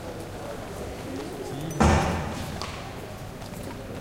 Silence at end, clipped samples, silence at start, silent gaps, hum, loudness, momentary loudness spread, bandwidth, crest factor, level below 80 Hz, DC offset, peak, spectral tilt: 0 s; under 0.1%; 0 s; none; none; -30 LUFS; 16 LU; 16.5 kHz; 24 dB; -38 dBFS; under 0.1%; -6 dBFS; -5.5 dB/octave